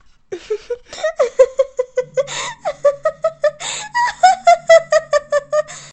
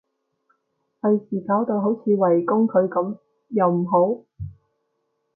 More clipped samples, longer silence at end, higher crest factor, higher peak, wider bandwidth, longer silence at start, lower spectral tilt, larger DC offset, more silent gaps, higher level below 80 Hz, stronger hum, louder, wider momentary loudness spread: neither; second, 0.05 s vs 0.85 s; about the same, 16 dB vs 16 dB; first, 0 dBFS vs -6 dBFS; first, 8.8 kHz vs 2.8 kHz; second, 0.3 s vs 1.05 s; second, -1 dB/octave vs -14.5 dB/octave; neither; neither; about the same, -54 dBFS vs -56 dBFS; neither; first, -16 LUFS vs -21 LUFS; about the same, 14 LU vs 14 LU